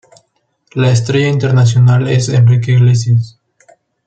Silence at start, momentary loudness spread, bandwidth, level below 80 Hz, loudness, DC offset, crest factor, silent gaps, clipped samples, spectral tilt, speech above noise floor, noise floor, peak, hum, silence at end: 0.75 s; 6 LU; 8.8 kHz; -48 dBFS; -11 LUFS; under 0.1%; 10 dB; none; under 0.1%; -6.5 dB/octave; 52 dB; -62 dBFS; -2 dBFS; none; 0.75 s